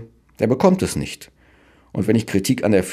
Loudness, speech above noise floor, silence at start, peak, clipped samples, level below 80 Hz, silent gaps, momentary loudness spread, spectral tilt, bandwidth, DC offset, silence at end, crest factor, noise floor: -19 LUFS; 34 dB; 0 s; -2 dBFS; under 0.1%; -48 dBFS; none; 14 LU; -6 dB/octave; 15.5 kHz; under 0.1%; 0 s; 18 dB; -53 dBFS